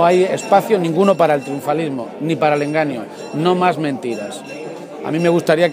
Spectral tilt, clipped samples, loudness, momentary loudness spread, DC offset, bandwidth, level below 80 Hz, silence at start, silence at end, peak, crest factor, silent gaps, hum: -6 dB/octave; under 0.1%; -17 LUFS; 14 LU; under 0.1%; 15.5 kHz; -68 dBFS; 0 s; 0 s; 0 dBFS; 16 dB; none; none